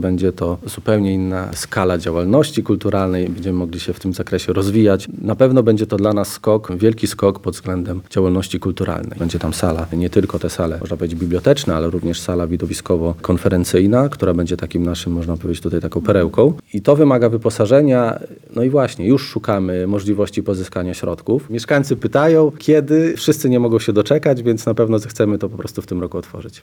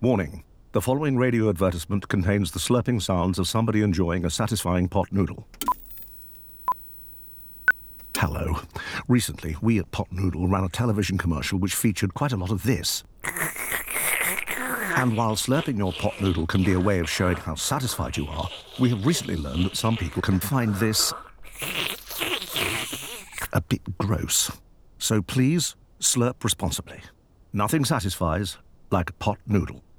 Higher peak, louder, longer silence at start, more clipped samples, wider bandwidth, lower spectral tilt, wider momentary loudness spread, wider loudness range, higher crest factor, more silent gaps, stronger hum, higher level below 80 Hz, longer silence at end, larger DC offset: first, 0 dBFS vs -10 dBFS; first, -17 LUFS vs -25 LUFS; about the same, 0 s vs 0 s; neither; about the same, 19.5 kHz vs over 20 kHz; first, -6.5 dB/octave vs -4.5 dB/octave; about the same, 10 LU vs 10 LU; about the same, 4 LU vs 3 LU; about the same, 16 dB vs 16 dB; neither; neither; first, -40 dBFS vs -46 dBFS; second, 0.05 s vs 0.2 s; neither